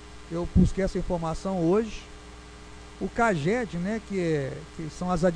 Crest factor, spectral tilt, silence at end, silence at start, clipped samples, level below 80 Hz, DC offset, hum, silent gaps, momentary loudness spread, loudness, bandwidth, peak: 16 dB; -7 dB/octave; 0 s; 0 s; under 0.1%; -38 dBFS; under 0.1%; none; none; 22 LU; -27 LUFS; 10.5 kHz; -10 dBFS